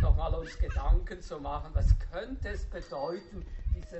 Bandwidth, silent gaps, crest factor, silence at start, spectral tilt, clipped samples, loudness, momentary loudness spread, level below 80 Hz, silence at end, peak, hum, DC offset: 8 kHz; none; 18 dB; 0 s; -6.5 dB/octave; under 0.1%; -34 LUFS; 11 LU; -30 dBFS; 0 s; -10 dBFS; none; under 0.1%